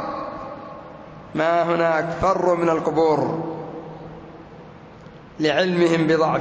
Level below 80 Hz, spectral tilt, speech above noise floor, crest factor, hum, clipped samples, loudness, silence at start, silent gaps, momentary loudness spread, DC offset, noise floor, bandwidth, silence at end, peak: -52 dBFS; -6.5 dB/octave; 23 dB; 14 dB; none; under 0.1%; -20 LUFS; 0 s; none; 22 LU; under 0.1%; -42 dBFS; 8 kHz; 0 s; -8 dBFS